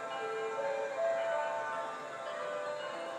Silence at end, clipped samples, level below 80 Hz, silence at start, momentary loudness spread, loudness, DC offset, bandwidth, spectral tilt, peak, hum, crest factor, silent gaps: 0 s; under 0.1%; -88 dBFS; 0 s; 6 LU; -37 LUFS; under 0.1%; 12 kHz; -2.5 dB/octave; -24 dBFS; none; 14 dB; none